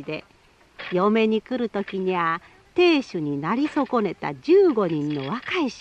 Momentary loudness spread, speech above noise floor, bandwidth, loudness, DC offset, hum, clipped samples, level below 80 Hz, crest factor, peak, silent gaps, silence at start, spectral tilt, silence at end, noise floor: 11 LU; 21 dB; 8.4 kHz; -23 LUFS; under 0.1%; none; under 0.1%; -62 dBFS; 16 dB; -8 dBFS; none; 0 s; -6.5 dB/octave; 0 s; -43 dBFS